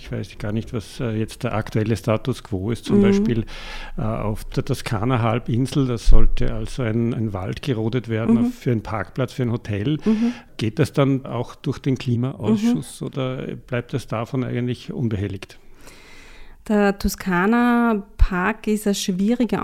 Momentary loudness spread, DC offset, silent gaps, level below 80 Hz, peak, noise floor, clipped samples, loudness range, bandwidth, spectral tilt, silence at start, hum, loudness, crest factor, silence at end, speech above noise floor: 9 LU; under 0.1%; none; -26 dBFS; 0 dBFS; -42 dBFS; under 0.1%; 4 LU; 15 kHz; -6.5 dB/octave; 0 s; none; -22 LUFS; 20 dB; 0 s; 22 dB